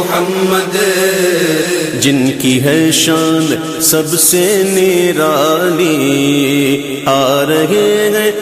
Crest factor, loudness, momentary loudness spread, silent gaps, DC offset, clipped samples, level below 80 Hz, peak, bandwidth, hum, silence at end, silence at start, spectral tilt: 12 dB; -11 LUFS; 4 LU; none; under 0.1%; under 0.1%; -50 dBFS; 0 dBFS; 15.5 kHz; none; 0 s; 0 s; -3.5 dB/octave